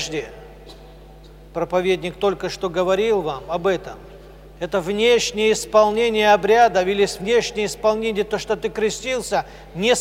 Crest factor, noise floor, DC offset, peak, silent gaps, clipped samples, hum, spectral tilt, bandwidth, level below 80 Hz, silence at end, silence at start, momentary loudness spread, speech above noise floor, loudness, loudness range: 18 dB; -42 dBFS; under 0.1%; -2 dBFS; none; under 0.1%; none; -3.5 dB/octave; 16 kHz; -46 dBFS; 0 s; 0 s; 11 LU; 23 dB; -20 LUFS; 6 LU